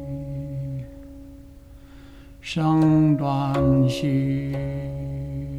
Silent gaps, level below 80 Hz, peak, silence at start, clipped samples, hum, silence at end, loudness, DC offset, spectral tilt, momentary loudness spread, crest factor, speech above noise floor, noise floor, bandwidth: none; -42 dBFS; -8 dBFS; 0 s; under 0.1%; none; 0 s; -23 LUFS; under 0.1%; -8 dB/octave; 20 LU; 14 dB; 24 dB; -44 dBFS; 11 kHz